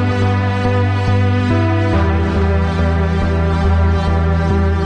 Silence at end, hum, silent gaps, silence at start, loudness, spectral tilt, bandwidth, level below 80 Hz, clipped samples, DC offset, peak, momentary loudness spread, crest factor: 0 s; none; none; 0 s; -15 LUFS; -8 dB/octave; 7.2 kHz; -26 dBFS; under 0.1%; under 0.1%; -2 dBFS; 1 LU; 10 dB